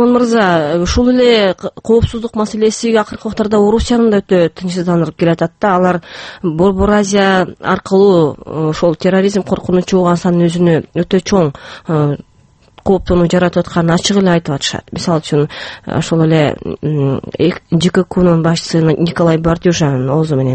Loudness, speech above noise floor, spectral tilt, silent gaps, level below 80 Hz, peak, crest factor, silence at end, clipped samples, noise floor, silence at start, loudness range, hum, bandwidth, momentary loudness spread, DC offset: -13 LUFS; 33 dB; -6 dB/octave; none; -34 dBFS; 0 dBFS; 12 dB; 0 s; under 0.1%; -45 dBFS; 0 s; 2 LU; none; 8.8 kHz; 8 LU; under 0.1%